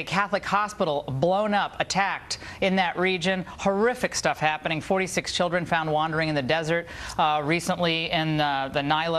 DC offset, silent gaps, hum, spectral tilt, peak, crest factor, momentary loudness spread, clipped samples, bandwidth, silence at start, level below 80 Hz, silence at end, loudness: under 0.1%; none; none; -4.5 dB/octave; -6 dBFS; 18 dB; 3 LU; under 0.1%; 14 kHz; 0 s; -52 dBFS; 0 s; -25 LUFS